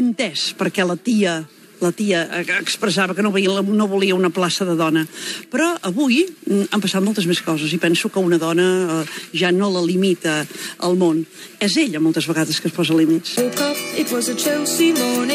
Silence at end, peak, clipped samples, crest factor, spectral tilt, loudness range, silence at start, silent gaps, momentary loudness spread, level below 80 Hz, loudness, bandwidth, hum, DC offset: 0 s; -4 dBFS; under 0.1%; 14 dB; -4 dB/octave; 1 LU; 0 s; none; 5 LU; -76 dBFS; -19 LUFS; 15.5 kHz; none; under 0.1%